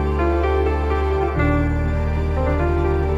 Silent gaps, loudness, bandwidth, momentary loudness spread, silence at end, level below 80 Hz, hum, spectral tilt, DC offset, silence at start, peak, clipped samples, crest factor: none; -20 LUFS; 7.4 kHz; 3 LU; 0 s; -22 dBFS; none; -9 dB/octave; under 0.1%; 0 s; -6 dBFS; under 0.1%; 12 dB